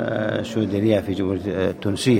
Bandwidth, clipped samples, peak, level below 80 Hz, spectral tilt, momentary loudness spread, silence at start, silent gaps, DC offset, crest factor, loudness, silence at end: 16 kHz; under 0.1%; -6 dBFS; -52 dBFS; -6.5 dB/octave; 4 LU; 0 s; none; under 0.1%; 16 dB; -22 LUFS; 0 s